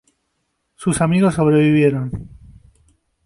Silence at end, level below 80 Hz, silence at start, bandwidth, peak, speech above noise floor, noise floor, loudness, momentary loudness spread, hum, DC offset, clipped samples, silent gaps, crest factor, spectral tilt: 1 s; -44 dBFS; 0.8 s; 11.5 kHz; -4 dBFS; 55 dB; -71 dBFS; -16 LUFS; 13 LU; none; under 0.1%; under 0.1%; none; 14 dB; -7 dB/octave